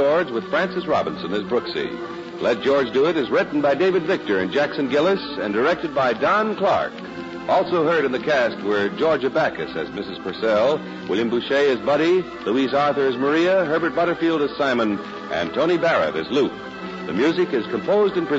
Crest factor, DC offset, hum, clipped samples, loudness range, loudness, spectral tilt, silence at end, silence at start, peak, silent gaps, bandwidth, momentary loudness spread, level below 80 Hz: 12 dB; under 0.1%; none; under 0.1%; 2 LU; -21 LUFS; -6 dB/octave; 0 s; 0 s; -8 dBFS; none; 7.8 kHz; 9 LU; -56 dBFS